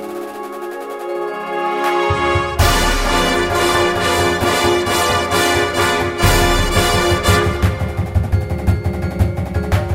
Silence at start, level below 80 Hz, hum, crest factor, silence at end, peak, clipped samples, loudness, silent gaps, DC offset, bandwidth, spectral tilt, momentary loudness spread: 0 s; -24 dBFS; none; 16 dB; 0 s; 0 dBFS; under 0.1%; -16 LUFS; none; under 0.1%; 16.5 kHz; -4.5 dB/octave; 9 LU